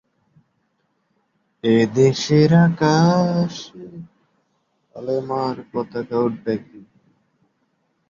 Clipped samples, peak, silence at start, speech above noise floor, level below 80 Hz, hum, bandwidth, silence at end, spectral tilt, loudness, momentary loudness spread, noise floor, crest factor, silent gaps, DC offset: under 0.1%; -2 dBFS; 1.65 s; 50 dB; -58 dBFS; none; 7.6 kHz; 1.3 s; -7 dB/octave; -19 LUFS; 19 LU; -69 dBFS; 18 dB; none; under 0.1%